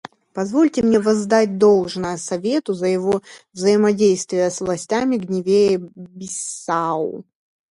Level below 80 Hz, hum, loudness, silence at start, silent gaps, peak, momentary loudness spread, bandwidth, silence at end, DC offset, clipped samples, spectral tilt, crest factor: -58 dBFS; none; -19 LUFS; 0.35 s; none; -2 dBFS; 12 LU; 11.5 kHz; 0.5 s; under 0.1%; under 0.1%; -5 dB/octave; 18 dB